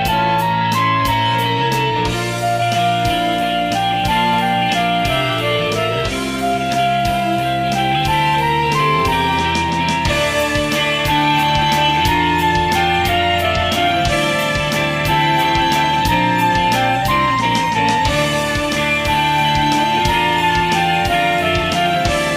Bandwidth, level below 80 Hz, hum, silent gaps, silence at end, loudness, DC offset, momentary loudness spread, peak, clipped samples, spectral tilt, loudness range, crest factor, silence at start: 15.5 kHz; -34 dBFS; none; none; 0 s; -15 LUFS; under 0.1%; 3 LU; -2 dBFS; under 0.1%; -4.5 dB/octave; 2 LU; 12 dB; 0 s